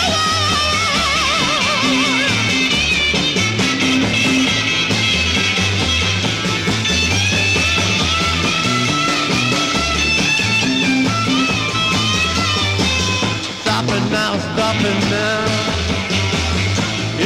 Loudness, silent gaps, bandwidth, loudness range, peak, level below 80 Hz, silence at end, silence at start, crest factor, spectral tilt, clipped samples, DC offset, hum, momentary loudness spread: -15 LUFS; none; 15.5 kHz; 3 LU; -4 dBFS; -34 dBFS; 0 s; 0 s; 12 dB; -3.5 dB/octave; under 0.1%; under 0.1%; none; 4 LU